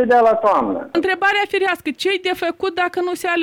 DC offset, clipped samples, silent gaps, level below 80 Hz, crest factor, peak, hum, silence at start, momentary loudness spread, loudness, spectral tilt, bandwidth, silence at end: under 0.1%; under 0.1%; none; -58 dBFS; 14 dB; -4 dBFS; none; 0 s; 7 LU; -18 LUFS; -3.5 dB/octave; 18 kHz; 0 s